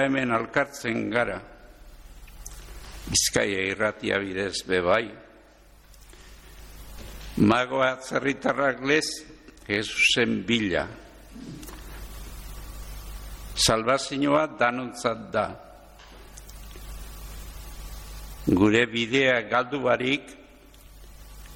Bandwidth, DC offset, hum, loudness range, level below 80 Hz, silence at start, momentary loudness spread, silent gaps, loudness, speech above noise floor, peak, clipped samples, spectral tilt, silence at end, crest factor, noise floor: 17 kHz; under 0.1%; none; 6 LU; -46 dBFS; 0 s; 22 LU; none; -24 LUFS; 29 dB; -8 dBFS; under 0.1%; -3.5 dB/octave; 0 s; 20 dB; -53 dBFS